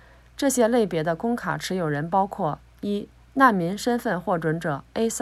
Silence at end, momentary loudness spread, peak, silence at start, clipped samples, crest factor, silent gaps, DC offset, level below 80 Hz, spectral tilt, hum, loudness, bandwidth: 0 s; 10 LU; -6 dBFS; 0.4 s; under 0.1%; 18 dB; none; under 0.1%; -54 dBFS; -5 dB/octave; none; -24 LUFS; 16 kHz